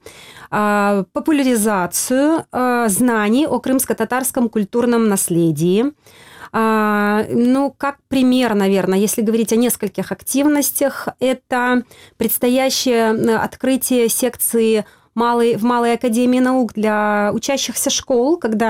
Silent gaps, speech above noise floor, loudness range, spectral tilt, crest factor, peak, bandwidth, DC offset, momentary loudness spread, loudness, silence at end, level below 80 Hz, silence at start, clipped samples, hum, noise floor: none; 23 dB; 1 LU; -4 dB/octave; 10 dB; -6 dBFS; 16.5 kHz; 0.1%; 5 LU; -16 LUFS; 0 s; -54 dBFS; 0.05 s; under 0.1%; none; -39 dBFS